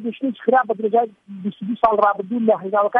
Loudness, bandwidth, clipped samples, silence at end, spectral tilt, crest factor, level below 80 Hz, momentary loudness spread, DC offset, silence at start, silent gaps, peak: -19 LUFS; 5.2 kHz; under 0.1%; 0 s; -9 dB/octave; 16 dB; -58 dBFS; 11 LU; under 0.1%; 0 s; none; -2 dBFS